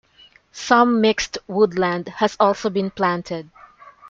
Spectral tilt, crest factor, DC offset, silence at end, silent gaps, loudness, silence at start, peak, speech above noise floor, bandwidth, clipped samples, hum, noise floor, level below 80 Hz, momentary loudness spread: -5 dB/octave; 18 dB; under 0.1%; 0 s; none; -19 LUFS; 0.55 s; -2 dBFS; 33 dB; 7.6 kHz; under 0.1%; none; -52 dBFS; -54 dBFS; 11 LU